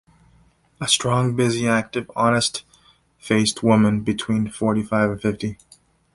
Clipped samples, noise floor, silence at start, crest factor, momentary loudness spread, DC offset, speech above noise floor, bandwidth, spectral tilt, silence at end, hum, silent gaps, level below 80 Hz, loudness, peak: under 0.1%; -57 dBFS; 0.8 s; 18 dB; 9 LU; under 0.1%; 37 dB; 11.5 kHz; -4.5 dB/octave; 0.6 s; none; none; -52 dBFS; -20 LUFS; -4 dBFS